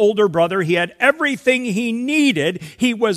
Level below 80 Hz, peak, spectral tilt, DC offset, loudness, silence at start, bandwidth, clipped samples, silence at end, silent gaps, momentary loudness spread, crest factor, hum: -60 dBFS; 0 dBFS; -5 dB/octave; under 0.1%; -17 LUFS; 0 s; 14.5 kHz; under 0.1%; 0 s; none; 5 LU; 18 dB; none